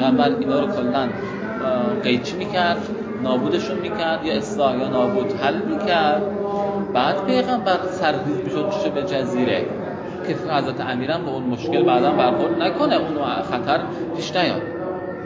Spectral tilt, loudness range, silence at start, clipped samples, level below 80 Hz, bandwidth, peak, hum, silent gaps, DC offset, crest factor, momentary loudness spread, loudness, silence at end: -6 dB/octave; 2 LU; 0 s; under 0.1%; -54 dBFS; 7.8 kHz; -4 dBFS; none; none; under 0.1%; 16 dB; 7 LU; -21 LUFS; 0 s